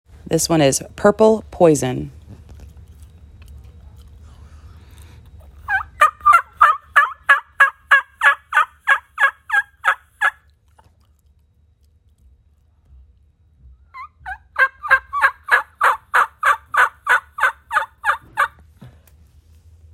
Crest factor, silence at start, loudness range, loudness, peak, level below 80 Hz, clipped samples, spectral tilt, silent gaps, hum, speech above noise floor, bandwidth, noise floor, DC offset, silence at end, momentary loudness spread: 20 dB; 0.3 s; 11 LU; -17 LUFS; 0 dBFS; -48 dBFS; under 0.1%; -3.5 dB/octave; none; none; 41 dB; 16 kHz; -57 dBFS; under 0.1%; 1.05 s; 9 LU